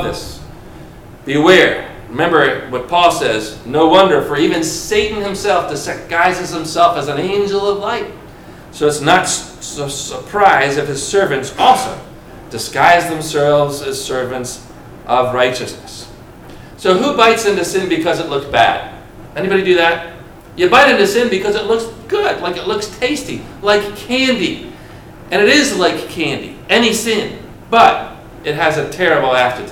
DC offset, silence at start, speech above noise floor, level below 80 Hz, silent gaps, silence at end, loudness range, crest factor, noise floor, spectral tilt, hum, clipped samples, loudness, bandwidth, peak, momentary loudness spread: under 0.1%; 0 s; 22 dB; -42 dBFS; none; 0 s; 4 LU; 14 dB; -35 dBFS; -3.5 dB/octave; none; under 0.1%; -14 LUFS; 17.5 kHz; 0 dBFS; 16 LU